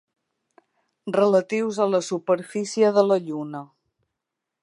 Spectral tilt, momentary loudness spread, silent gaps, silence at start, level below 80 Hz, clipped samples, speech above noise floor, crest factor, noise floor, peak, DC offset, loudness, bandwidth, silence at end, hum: -5.5 dB/octave; 13 LU; none; 1.05 s; -80 dBFS; under 0.1%; 62 dB; 20 dB; -84 dBFS; -4 dBFS; under 0.1%; -22 LUFS; 11.5 kHz; 0.95 s; none